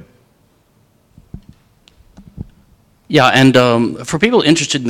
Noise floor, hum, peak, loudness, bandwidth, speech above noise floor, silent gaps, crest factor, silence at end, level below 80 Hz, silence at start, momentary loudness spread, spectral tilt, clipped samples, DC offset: -55 dBFS; none; 0 dBFS; -12 LUFS; 15.5 kHz; 43 dB; none; 16 dB; 0 s; -46 dBFS; 1.35 s; 26 LU; -4.5 dB/octave; 0.2%; under 0.1%